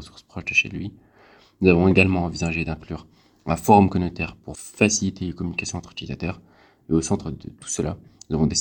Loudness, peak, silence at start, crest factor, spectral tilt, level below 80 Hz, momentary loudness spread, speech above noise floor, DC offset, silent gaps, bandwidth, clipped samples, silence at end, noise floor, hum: -22 LUFS; 0 dBFS; 0 s; 22 dB; -5 dB/octave; -44 dBFS; 20 LU; 31 dB; under 0.1%; none; 19 kHz; under 0.1%; 0 s; -53 dBFS; none